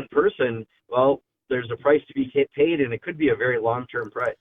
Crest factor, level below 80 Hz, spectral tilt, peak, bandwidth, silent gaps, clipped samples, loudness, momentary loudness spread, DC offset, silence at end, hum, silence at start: 16 dB; -60 dBFS; -8.5 dB/octave; -6 dBFS; 3.9 kHz; none; under 0.1%; -23 LUFS; 7 LU; under 0.1%; 0.1 s; none; 0 s